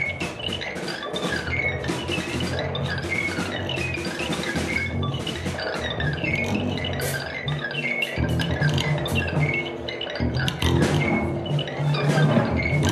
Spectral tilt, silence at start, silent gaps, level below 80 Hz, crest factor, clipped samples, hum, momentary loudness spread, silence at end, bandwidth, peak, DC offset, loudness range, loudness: -5.5 dB/octave; 0 s; none; -40 dBFS; 20 dB; under 0.1%; none; 7 LU; 0 s; 14 kHz; -4 dBFS; under 0.1%; 3 LU; -25 LUFS